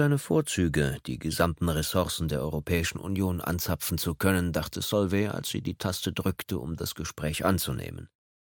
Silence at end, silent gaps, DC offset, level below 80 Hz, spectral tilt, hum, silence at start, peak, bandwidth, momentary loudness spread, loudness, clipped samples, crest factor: 0.4 s; none; under 0.1%; -44 dBFS; -5 dB/octave; none; 0 s; -8 dBFS; 17.5 kHz; 7 LU; -29 LUFS; under 0.1%; 20 dB